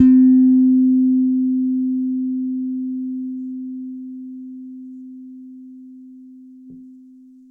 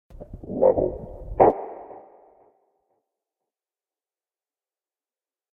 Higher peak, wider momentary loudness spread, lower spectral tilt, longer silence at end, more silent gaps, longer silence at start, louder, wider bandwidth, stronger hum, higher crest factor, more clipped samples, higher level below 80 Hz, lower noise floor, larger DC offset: about the same, -2 dBFS vs -2 dBFS; about the same, 25 LU vs 23 LU; second, -10 dB/octave vs -11.5 dB/octave; second, 0.6 s vs 3.55 s; neither; second, 0 s vs 0.15 s; first, -17 LUFS vs -22 LUFS; second, 1.9 kHz vs 3.1 kHz; neither; second, 16 dB vs 26 dB; neither; second, -64 dBFS vs -46 dBFS; second, -45 dBFS vs under -90 dBFS; neither